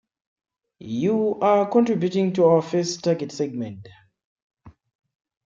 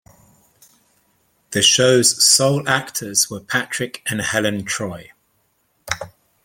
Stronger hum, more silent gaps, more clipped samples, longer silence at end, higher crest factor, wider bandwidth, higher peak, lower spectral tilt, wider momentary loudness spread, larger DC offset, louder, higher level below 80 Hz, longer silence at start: neither; first, 4.24-4.36 s, 4.42-4.50 s vs none; neither; first, 0.75 s vs 0.35 s; about the same, 18 dB vs 20 dB; second, 7.6 kHz vs 17 kHz; second, -6 dBFS vs 0 dBFS; first, -6.5 dB/octave vs -2 dB/octave; second, 13 LU vs 16 LU; neither; second, -22 LUFS vs -17 LUFS; second, -66 dBFS vs -58 dBFS; second, 0.8 s vs 1.5 s